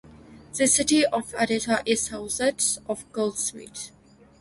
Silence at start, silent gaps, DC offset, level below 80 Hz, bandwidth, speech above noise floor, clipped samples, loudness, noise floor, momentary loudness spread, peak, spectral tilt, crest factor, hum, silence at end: 0.05 s; none; under 0.1%; -56 dBFS; 12 kHz; 23 dB; under 0.1%; -24 LUFS; -48 dBFS; 17 LU; -8 dBFS; -2 dB/octave; 18 dB; none; 0.55 s